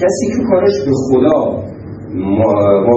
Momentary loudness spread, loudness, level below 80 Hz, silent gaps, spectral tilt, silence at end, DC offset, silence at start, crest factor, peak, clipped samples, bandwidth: 13 LU; -13 LUFS; -44 dBFS; none; -7 dB/octave; 0 s; under 0.1%; 0 s; 12 dB; 0 dBFS; under 0.1%; 8.6 kHz